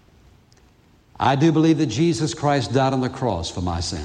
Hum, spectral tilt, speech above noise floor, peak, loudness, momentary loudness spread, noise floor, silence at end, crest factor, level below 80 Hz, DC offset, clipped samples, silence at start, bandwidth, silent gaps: none; -6 dB/octave; 35 dB; -4 dBFS; -20 LUFS; 8 LU; -55 dBFS; 0 s; 16 dB; -48 dBFS; under 0.1%; under 0.1%; 1.2 s; 10.5 kHz; none